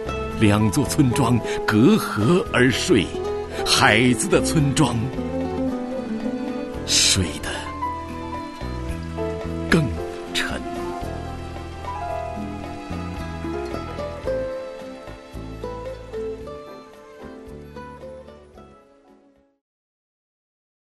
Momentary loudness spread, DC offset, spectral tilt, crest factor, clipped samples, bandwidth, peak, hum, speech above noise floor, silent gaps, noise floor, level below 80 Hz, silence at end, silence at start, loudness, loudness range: 20 LU; under 0.1%; -4.5 dB/octave; 22 dB; under 0.1%; 12.5 kHz; 0 dBFS; none; 38 dB; none; -56 dBFS; -40 dBFS; 2.1 s; 0 s; -22 LUFS; 17 LU